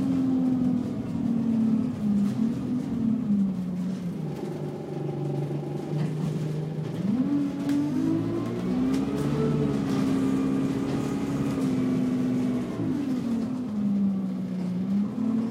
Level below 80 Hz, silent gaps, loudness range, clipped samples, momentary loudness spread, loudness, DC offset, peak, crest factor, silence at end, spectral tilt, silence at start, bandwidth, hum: -54 dBFS; none; 3 LU; under 0.1%; 6 LU; -27 LUFS; under 0.1%; -14 dBFS; 12 dB; 0 s; -8 dB/octave; 0 s; 13.5 kHz; none